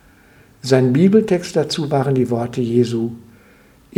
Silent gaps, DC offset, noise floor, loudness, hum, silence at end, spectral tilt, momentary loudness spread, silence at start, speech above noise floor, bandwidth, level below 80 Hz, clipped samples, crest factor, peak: none; under 0.1%; -49 dBFS; -17 LUFS; none; 0.8 s; -7 dB/octave; 8 LU; 0.65 s; 33 dB; 14 kHz; -54 dBFS; under 0.1%; 18 dB; 0 dBFS